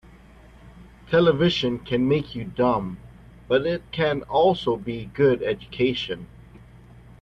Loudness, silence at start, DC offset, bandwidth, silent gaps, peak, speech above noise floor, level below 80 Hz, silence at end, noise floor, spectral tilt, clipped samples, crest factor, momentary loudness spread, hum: -23 LUFS; 0.65 s; under 0.1%; 7.6 kHz; none; -6 dBFS; 26 dB; -50 dBFS; 0.95 s; -48 dBFS; -7 dB/octave; under 0.1%; 18 dB; 12 LU; none